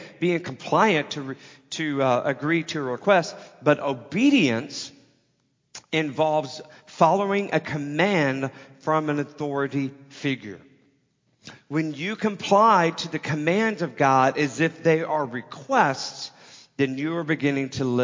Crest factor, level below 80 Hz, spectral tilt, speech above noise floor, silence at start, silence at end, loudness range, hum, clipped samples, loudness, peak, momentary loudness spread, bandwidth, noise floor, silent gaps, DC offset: 20 dB; -68 dBFS; -5.5 dB/octave; 46 dB; 0 s; 0 s; 6 LU; none; under 0.1%; -23 LUFS; -4 dBFS; 14 LU; 7.6 kHz; -69 dBFS; none; under 0.1%